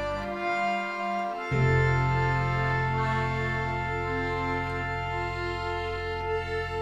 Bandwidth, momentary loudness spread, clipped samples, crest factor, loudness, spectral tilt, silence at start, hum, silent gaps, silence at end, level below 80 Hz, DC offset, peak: 8.2 kHz; 6 LU; under 0.1%; 16 dB; -28 LUFS; -7 dB/octave; 0 s; none; none; 0 s; -42 dBFS; under 0.1%; -12 dBFS